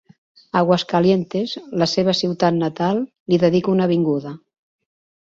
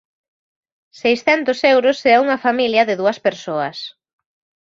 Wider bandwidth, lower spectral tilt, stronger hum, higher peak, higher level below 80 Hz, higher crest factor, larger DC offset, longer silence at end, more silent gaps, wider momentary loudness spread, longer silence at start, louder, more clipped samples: about the same, 7.6 kHz vs 7.6 kHz; first, -6.5 dB/octave vs -4.5 dB/octave; neither; about the same, -2 dBFS vs -2 dBFS; about the same, -58 dBFS vs -62 dBFS; about the same, 18 dB vs 16 dB; neither; about the same, 0.85 s vs 0.8 s; first, 3.20-3.26 s vs none; about the same, 8 LU vs 9 LU; second, 0.55 s vs 1.05 s; second, -19 LUFS vs -16 LUFS; neither